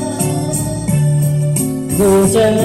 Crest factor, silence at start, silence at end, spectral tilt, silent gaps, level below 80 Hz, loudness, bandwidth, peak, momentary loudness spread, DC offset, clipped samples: 12 dB; 0 s; 0 s; -6 dB/octave; none; -36 dBFS; -14 LUFS; 15.5 kHz; -2 dBFS; 7 LU; 0.3%; under 0.1%